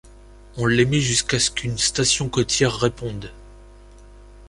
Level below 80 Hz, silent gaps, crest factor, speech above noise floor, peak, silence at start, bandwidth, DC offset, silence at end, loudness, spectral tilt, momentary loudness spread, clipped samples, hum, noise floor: -42 dBFS; none; 18 dB; 24 dB; -4 dBFS; 0.05 s; 11.5 kHz; under 0.1%; 0 s; -20 LUFS; -3.5 dB/octave; 14 LU; under 0.1%; 50 Hz at -40 dBFS; -45 dBFS